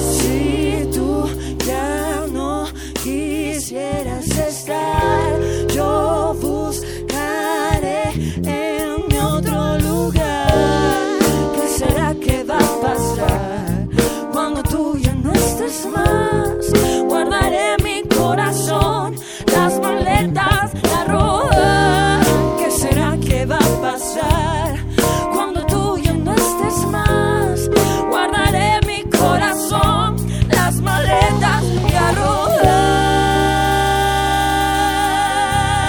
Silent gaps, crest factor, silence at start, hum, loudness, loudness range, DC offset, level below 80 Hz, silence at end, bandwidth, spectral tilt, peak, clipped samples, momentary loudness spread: none; 16 dB; 0 s; none; -17 LUFS; 5 LU; under 0.1%; -28 dBFS; 0 s; over 20 kHz; -5 dB/octave; 0 dBFS; under 0.1%; 7 LU